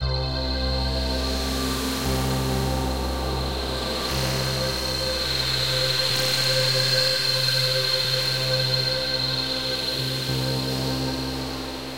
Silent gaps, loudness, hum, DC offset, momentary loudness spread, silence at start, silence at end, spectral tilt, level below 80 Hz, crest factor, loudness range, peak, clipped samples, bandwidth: none; -23 LUFS; none; 0.5%; 7 LU; 0 s; 0 s; -3.5 dB/octave; -34 dBFS; 16 dB; 5 LU; -8 dBFS; under 0.1%; 16 kHz